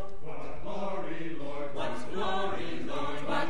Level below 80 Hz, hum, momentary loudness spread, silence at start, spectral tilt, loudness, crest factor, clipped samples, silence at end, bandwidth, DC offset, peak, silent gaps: -54 dBFS; none; 9 LU; 0 s; -5.5 dB/octave; -36 LUFS; 18 dB; under 0.1%; 0 s; 11.5 kHz; 5%; -16 dBFS; none